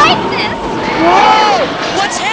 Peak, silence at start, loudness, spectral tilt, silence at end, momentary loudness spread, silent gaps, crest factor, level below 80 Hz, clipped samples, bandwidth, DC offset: 0 dBFS; 0 s; -11 LUFS; -3.5 dB/octave; 0 s; 8 LU; none; 10 dB; -38 dBFS; 0.1%; 8 kHz; 0.2%